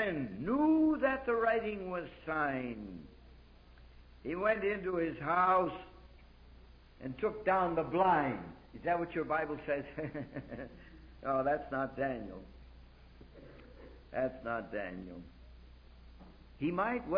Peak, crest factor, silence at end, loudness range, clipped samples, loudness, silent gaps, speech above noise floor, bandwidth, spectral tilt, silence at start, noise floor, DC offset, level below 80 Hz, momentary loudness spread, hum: -18 dBFS; 18 dB; 0 s; 10 LU; under 0.1%; -34 LUFS; none; 23 dB; 5.2 kHz; -5 dB/octave; 0 s; -58 dBFS; under 0.1%; -58 dBFS; 21 LU; none